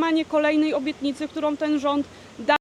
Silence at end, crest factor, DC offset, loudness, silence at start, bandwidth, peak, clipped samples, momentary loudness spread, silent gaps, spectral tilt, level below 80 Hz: 0.05 s; 16 dB; under 0.1%; -24 LUFS; 0 s; 10.5 kHz; -6 dBFS; under 0.1%; 7 LU; none; -4.5 dB/octave; -62 dBFS